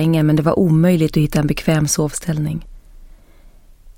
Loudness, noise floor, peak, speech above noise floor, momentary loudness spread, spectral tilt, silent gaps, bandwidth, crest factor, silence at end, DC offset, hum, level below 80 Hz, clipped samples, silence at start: -16 LUFS; -44 dBFS; -2 dBFS; 29 dB; 8 LU; -6 dB/octave; none; 17 kHz; 14 dB; 0.05 s; under 0.1%; none; -38 dBFS; under 0.1%; 0 s